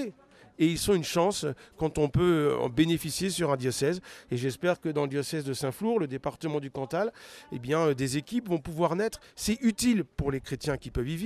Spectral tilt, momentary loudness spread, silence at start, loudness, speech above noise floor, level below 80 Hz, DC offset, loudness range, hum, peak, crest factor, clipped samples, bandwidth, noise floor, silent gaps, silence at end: -5.5 dB/octave; 8 LU; 0 s; -29 LUFS; 19 dB; -50 dBFS; under 0.1%; 4 LU; none; -12 dBFS; 18 dB; under 0.1%; 14.5 kHz; -48 dBFS; none; 0 s